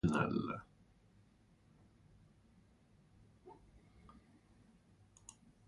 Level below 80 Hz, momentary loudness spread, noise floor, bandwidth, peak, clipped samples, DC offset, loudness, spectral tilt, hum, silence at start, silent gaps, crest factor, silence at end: -64 dBFS; 30 LU; -69 dBFS; 11 kHz; -18 dBFS; under 0.1%; under 0.1%; -39 LUFS; -7 dB/octave; none; 0.05 s; none; 26 dB; 2.15 s